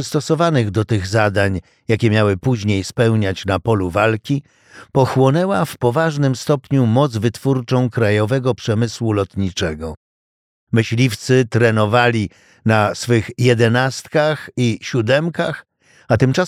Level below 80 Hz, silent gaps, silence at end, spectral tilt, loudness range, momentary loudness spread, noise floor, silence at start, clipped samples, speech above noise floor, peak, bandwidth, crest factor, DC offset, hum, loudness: -48 dBFS; 9.97-10.67 s; 0 s; -6.5 dB/octave; 3 LU; 7 LU; under -90 dBFS; 0 s; under 0.1%; over 73 dB; -2 dBFS; 15 kHz; 16 dB; under 0.1%; none; -17 LUFS